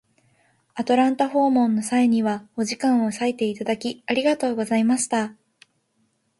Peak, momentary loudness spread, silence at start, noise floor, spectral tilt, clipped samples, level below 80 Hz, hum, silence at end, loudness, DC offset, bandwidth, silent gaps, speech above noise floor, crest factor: -6 dBFS; 8 LU; 0.75 s; -68 dBFS; -4.5 dB/octave; under 0.1%; -68 dBFS; none; 1.1 s; -22 LUFS; under 0.1%; 11.5 kHz; none; 47 dB; 16 dB